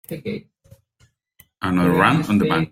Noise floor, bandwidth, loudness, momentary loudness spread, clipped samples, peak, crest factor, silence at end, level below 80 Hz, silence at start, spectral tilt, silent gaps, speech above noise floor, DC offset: -61 dBFS; 16.5 kHz; -19 LUFS; 15 LU; under 0.1%; 0 dBFS; 20 dB; 0.05 s; -54 dBFS; 0.1 s; -7 dB/octave; none; 42 dB; under 0.1%